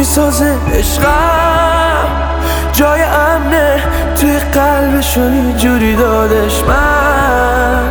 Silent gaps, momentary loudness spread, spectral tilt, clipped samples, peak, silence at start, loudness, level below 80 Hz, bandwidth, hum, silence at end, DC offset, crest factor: none; 3 LU; -5 dB/octave; under 0.1%; 0 dBFS; 0 s; -11 LUFS; -18 dBFS; over 20 kHz; none; 0 s; under 0.1%; 10 dB